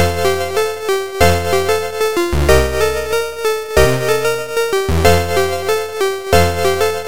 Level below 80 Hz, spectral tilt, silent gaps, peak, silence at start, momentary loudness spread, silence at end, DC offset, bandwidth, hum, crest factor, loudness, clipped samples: -26 dBFS; -4.5 dB/octave; none; 0 dBFS; 0 s; 6 LU; 0 s; 4%; 17 kHz; none; 16 dB; -15 LUFS; under 0.1%